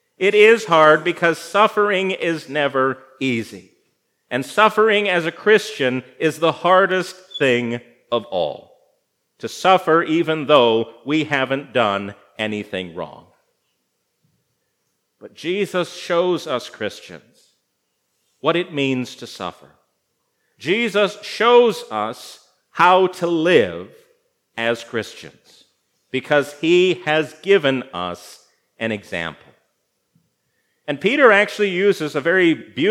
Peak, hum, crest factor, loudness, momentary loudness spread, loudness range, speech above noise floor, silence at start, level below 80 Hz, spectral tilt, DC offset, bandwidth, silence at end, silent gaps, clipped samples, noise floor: 0 dBFS; none; 20 dB; -18 LUFS; 16 LU; 9 LU; 53 dB; 0.2 s; -72 dBFS; -5 dB/octave; under 0.1%; 15.5 kHz; 0 s; none; under 0.1%; -72 dBFS